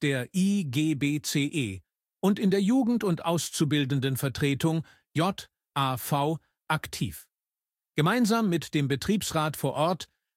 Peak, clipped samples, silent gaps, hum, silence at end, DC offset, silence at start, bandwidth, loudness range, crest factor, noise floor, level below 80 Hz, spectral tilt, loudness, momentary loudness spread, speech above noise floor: -12 dBFS; under 0.1%; none; none; 0.35 s; under 0.1%; 0 s; 16.5 kHz; 3 LU; 16 dB; under -90 dBFS; -60 dBFS; -5.5 dB/octave; -27 LUFS; 10 LU; over 63 dB